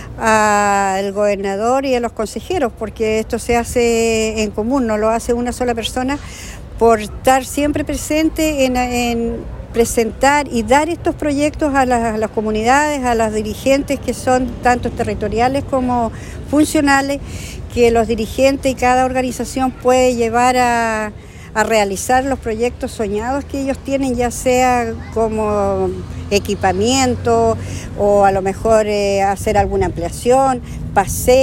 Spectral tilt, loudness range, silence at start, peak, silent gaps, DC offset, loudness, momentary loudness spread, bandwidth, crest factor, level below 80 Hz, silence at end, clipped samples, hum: -4.5 dB/octave; 2 LU; 0 s; 0 dBFS; none; under 0.1%; -16 LUFS; 8 LU; 16.5 kHz; 16 dB; -34 dBFS; 0 s; under 0.1%; none